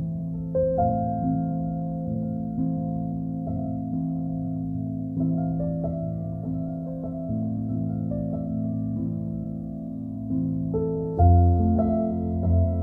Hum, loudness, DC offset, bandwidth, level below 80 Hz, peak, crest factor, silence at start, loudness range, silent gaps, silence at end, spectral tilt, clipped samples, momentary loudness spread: none; -27 LUFS; under 0.1%; 1.7 kHz; -38 dBFS; -8 dBFS; 18 dB; 0 s; 5 LU; none; 0 s; -14 dB/octave; under 0.1%; 9 LU